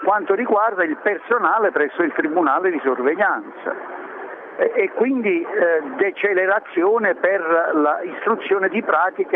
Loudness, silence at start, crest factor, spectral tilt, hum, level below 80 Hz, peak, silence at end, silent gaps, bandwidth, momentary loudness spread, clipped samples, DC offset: -19 LUFS; 0 s; 14 dB; -8 dB/octave; none; -78 dBFS; -4 dBFS; 0 s; none; 3.9 kHz; 8 LU; under 0.1%; under 0.1%